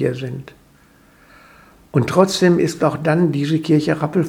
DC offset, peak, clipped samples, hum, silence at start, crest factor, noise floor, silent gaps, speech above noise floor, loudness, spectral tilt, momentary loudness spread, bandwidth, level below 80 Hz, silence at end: under 0.1%; 0 dBFS; under 0.1%; none; 0 s; 18 dB; -51 dBFS; none; 34 dB; -17 LUFS; -6.5 dB/octave; 10 LU; 16 kHz; -54 dBFS; 0 s